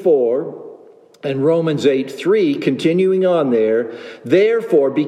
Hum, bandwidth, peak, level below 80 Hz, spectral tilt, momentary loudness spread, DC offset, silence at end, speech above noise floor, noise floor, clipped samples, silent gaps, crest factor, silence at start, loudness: none; 12 kHz; -2 dBFS; -72 dBFS; -7 dB/octave; 12 LU; under 0.1%; 0 s; 28 dB; -44 dBFS; under 0.1%; none; 14 dB; 0 s; -16 LUFS